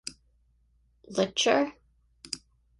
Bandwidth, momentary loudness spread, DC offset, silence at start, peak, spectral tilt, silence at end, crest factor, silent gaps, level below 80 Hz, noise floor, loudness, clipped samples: 11.5 kHz; 15 LU; under 0.1%; 0.05 s; -10 dBFS; -3 dB/octave; 0.45 s; 22 dB; none; -66 dBFS; -67 dBFS; -28 LUFS; under 0.1%